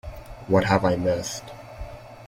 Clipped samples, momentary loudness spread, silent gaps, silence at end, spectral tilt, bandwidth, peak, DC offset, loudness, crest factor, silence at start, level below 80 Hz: under 0.1%; 21 LU; none; 0 s; -5.5 dB/octave; 16.5 kHz; -6 dBFS; under 0.1%; -23 LUFS; 20 dB; 0.05 s; -44 dBFS